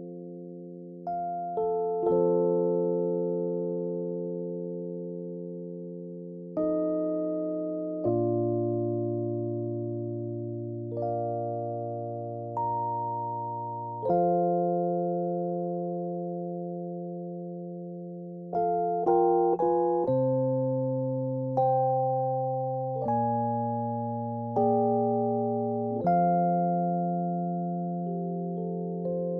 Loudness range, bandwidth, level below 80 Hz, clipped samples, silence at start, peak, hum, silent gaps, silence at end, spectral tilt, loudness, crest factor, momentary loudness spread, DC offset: 6 LU; 2.2 kHz; -68 dBFS; under 0.1%; 0 s; -12 dBFS; none; none; 0 s; -13.5 dB/octave; -29 LUFS; 16 dB; 12 LU; under 0.1%